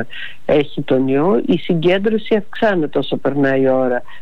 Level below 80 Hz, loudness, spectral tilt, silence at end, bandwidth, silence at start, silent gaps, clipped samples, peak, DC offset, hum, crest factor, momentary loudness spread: -50 dBFS; -17 LUFS; -8 dB/octave; 0.05 s; 6.6 kHz; 0 s; none; under 0.1%; -6 dBFS; 5%; none; 12 dB; 5 LU